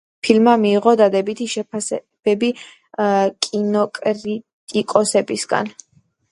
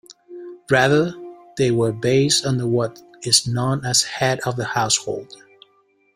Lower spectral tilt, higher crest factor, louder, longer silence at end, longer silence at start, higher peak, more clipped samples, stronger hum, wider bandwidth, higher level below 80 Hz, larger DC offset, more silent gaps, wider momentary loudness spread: about the same, -4.5 dB/octave vs -3.5 dB/octave; about the same, 18 dB vs 20 dB; about the same, -18 LUFS vs -19 LUFS; second, 0.6 s vs 0.8 s; first, 0.25 s vs 0.1 s; about the same, 0 dBFS vs -2 dBFS; neither; neither; second, 11.5 kHz vs 16 kHz; second, -66 dBFS vs -56 dBFS; neither; first, 4.53-4.67 s vs none; second, 11 LU vs 16 LU